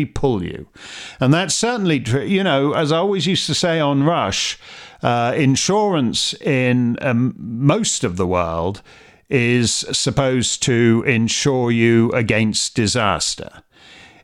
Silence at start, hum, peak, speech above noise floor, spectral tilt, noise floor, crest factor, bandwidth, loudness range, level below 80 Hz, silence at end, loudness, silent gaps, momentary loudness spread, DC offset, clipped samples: 0 s; none; -2 dBFS; 27 dB; -4.5 dB/octave; -45 dBFS; 16 dB; 13.5 kHz; 3 LU; -46 dBFS; 0.65 s; -17 LUFS; none; 8 LU; under 0.1%; under 0.1%